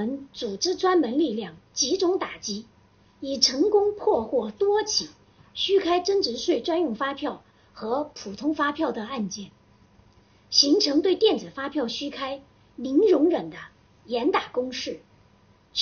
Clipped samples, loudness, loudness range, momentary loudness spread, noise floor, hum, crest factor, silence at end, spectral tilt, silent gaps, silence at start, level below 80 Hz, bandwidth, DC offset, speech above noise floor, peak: under 0.1%; -24 LUFS; 5 LU; 15 LU; -58 dBFS; none; 22 dB; 0 s; -2 dB/octave; none; 0 s; -62 dBFS; 7 kHz; under 0.1%; 34 dB; -4 dBFS